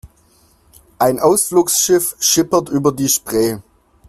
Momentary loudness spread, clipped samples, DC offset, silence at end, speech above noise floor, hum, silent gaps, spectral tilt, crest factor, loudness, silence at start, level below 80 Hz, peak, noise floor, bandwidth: 5 LU; under 0.1%; under 0.1%; 0.5 s; 38 dB; none; none; -3.5 dB/octave; 16 dB; -15 LUFS; 0.05 s; -50 dBFS; 0 dBFS; -53 dBFS; 16 kHz